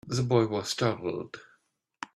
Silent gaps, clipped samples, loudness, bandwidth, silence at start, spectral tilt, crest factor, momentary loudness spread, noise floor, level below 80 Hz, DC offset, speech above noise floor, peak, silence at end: none; under 0.1%; -29 LUFS; 13.5 kHz; 0.05 s; -5.5 dB/octave; 20 dB; 18 LU; -71 dBFS; -64 dBFS; under 0.1%; 42 dB; -10 dBFS; 0.1 s